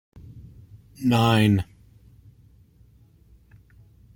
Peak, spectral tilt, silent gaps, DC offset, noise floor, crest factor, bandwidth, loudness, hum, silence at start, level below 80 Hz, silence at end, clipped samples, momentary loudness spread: -8 dBFS; -6.5 dB/octave; none; under 0.1%; -55 dBFS; 20 dB; 16.5 kHz; -21 LUFS; none; 0.35 s; -52 dBFS; 2.5 s; under 0.1%; 27 LU